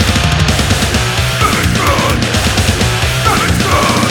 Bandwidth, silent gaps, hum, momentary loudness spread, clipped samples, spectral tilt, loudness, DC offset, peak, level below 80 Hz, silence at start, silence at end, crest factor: 19 kHz; none; none; 2 LU; under 0.1%; -4 dB/octave; -11 LUFS; under 0.1%; 0 dBFS; -20 dBFS; 0 s; 0 s; 12 dB